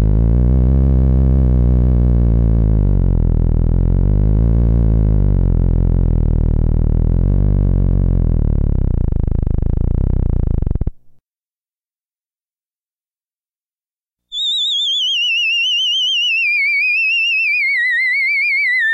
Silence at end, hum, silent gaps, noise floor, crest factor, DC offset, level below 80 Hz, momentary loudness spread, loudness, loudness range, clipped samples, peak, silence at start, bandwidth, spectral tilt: 0 s; none; 12.06-12.11 s, 13.56-13.60 s; under -90 dBFS; 10 dB; under 0.1%; -16 dBFS; 6 LU; -15 LUFS; 10 LU; under 0.1%; -6 dBFS; 0 s; 8 kHz; -5.5 dB/octave